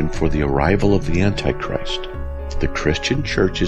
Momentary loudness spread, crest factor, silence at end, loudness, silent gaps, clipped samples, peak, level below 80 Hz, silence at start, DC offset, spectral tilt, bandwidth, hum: 9 LU; 16 dB; 0 s; -20 LUFS; none; under 0.1%; -4 dBFS; -26 dBFS; 0 s; under 0.1%; -6 dB/octave; 8.8 kHz; none